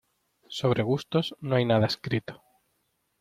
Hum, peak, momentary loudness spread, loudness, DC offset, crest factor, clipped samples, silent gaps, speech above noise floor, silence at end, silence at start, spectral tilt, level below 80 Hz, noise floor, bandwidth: none; -10 dBFS; 8 LU; -27 LUFS; under 0.1%; 18 dB; under 0.1%; none; 48 dB; 0.85 s; 0.5 s; -6.5 dB/octave; -62 dBFS; -75 dBFS; 14.5 kHz